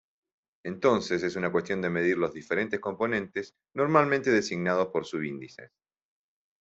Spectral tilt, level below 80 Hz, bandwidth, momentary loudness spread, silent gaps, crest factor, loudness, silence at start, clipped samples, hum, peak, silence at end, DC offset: -6 dB/octave; -68 dBFS; 8 kHz; 13 LU; none; 24 dB; -28 LUFS; 0.65 s; under 0.1%; none; -6 dBFS; 0.95 s; under 0.1%